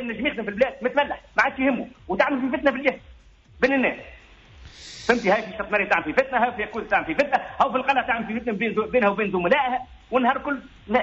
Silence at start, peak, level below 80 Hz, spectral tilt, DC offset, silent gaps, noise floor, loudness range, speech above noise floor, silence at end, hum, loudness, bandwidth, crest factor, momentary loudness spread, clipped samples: 0 s; -6 dBFS; -52 dBFS; -3 dB/octave; under 0.1%; none; -50 dBFS; 3 LU; 27 dB; 0 s; none; -23 LUFS; 7.6 kHz; 16 dB; 9 LU; under 0.1%